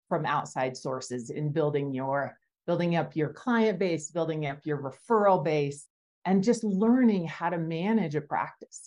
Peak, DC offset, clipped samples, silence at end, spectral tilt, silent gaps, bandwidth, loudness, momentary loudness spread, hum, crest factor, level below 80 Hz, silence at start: -12 dBFS; under 0.1%; under 0.1%; 0 s; -6.5 dB/octave; 5.90-6.22 s; 11 kHz; -28 LUFS; 11 LU; none; 16 dB; -74 dBFS; 0.1 s